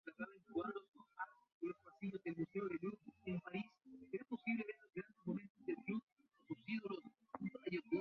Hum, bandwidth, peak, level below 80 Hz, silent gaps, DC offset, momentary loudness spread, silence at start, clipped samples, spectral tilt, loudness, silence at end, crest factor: none; 6 kHz; -28 dBFS; -84 dBFS; 0.88-0.92 s, 1.54-1.61 s, 5.50-5.55 s, 6.03-6.16 s; under 0.1%; 9 LU; 0.05 s; under 0.1%; -6 dB/octave; -48 LUFS; 0 s; 18 dB